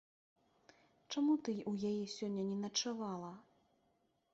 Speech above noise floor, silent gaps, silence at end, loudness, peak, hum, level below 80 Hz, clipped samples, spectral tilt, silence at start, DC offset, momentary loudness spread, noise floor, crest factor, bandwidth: 40 dB; none; 0.95 s; -39 LUFS; -24 dBFS; none; -82 dBFS; under 0.1%; -5 dB/octave; 1.1 s; under 0.1%; 11 LU; -79 dBFS; 18 dB; 8 kHz